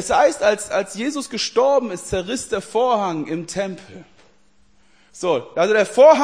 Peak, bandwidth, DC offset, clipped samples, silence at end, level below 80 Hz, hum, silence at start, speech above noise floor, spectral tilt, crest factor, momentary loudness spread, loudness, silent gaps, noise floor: -2 dBFS; 10.5 kHz; 0.2%; under 0.1%; 0 s; -50 dBFS; none; 0 s; 41 dB; -3.5 dB/octave; 18 dB; 10 LU; -20 LUFS; none; -59 dBFS